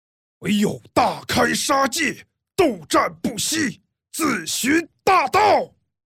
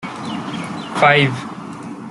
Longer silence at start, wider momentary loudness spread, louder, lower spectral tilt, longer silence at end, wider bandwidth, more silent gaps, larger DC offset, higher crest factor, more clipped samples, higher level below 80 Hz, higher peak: first, 0.4 s vs 0 s; second, 9 LU vs 19 LU; second, -20 LUFS vs -17 LUFS; second, -3 dB/octave vs -5.5 dB/octave; first, 0.4 s vs 0 s; first, 17 kHz vs 11.5 kHz; neither; neither; about the same, 16 dB vs 18 dB; neither; about the same, -54 dBFS vs -58 dBFS; second, -6 dBFS vs -2 dBFS